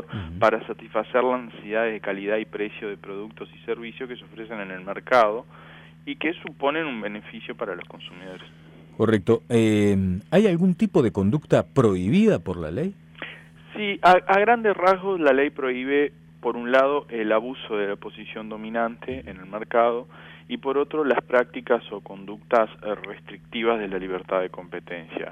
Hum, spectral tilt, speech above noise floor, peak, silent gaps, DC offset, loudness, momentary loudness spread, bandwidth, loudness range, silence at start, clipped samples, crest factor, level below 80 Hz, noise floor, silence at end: none; -7 dB/octave; 20 dB; -6 dBFS; none; under 0.1%; -23 LUFS; 17 LU; 12.5 kHz; 7 LU; 0 s; under 0.1%; 18 dB; -56 dBFS; -43 dBFS; 0 s